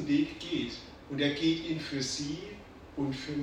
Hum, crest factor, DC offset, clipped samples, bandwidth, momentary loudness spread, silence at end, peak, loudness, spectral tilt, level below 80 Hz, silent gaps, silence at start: none; 18 dB; under 0.1%; under 0.1%; 10.5 kHz; 15 LU; 0 s; -16 dBFS; -33 LUFS; -4.5 dB/octave; -58 dBFS; none; 0 s